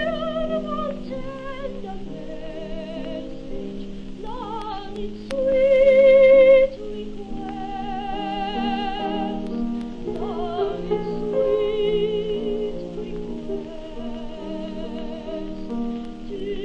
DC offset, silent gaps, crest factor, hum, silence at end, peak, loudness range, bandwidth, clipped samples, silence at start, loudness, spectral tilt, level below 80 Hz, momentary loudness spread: under 0.1%; none; 16 dB; none; 0 s; -6 dBFS; 16 LU; 6.8 kHz; under 0.1%; 0 s; -23 LUFS; -7 dB/octave; -38 dBFS; 19 LU